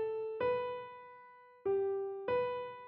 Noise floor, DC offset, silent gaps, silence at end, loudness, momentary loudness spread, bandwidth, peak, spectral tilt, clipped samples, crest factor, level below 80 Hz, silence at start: -58 dBFS; under 0.1%; none; 0 s; -37 LUFS; 17 LU; 5.4 kHz; -24 dBFS; -4 dB/octave; under 0.1%; 14 dB; -74 dBFS; 0 s